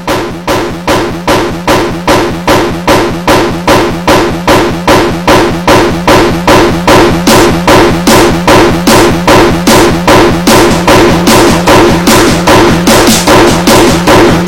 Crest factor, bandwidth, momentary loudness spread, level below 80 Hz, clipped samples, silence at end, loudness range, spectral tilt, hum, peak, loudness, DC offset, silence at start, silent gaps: 6 dB; 17.5 kHz; 5 LU; -20 dBFS; 0.9%; 0 s; 4 LU; -4.5 dB/octave; none; 0 dBFS; -5 LUFS; under 0.1%; 0 s; none